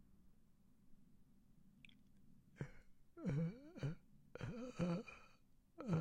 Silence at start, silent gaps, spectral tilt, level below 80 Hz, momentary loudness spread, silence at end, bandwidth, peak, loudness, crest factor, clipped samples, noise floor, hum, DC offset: 0.1 s; none; -8 dB/octave; -68 dBFS; 23 LU; 0 s; 8.8 kHz; -26 dBFS; -48 LUFS; 22 dB; under 0.1%; -70 dBFS; none; under 0.1%